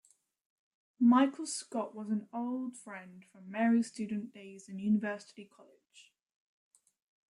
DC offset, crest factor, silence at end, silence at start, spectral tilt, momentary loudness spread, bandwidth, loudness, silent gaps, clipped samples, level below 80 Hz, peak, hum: under 0.1%; 20 dB; 1.3 s; 1 s; -5 dB/octave; 22 LU; 11.5 kHz; -33 LUFS; none; under 0.1%; -82 dBFS; -16 dBFS; none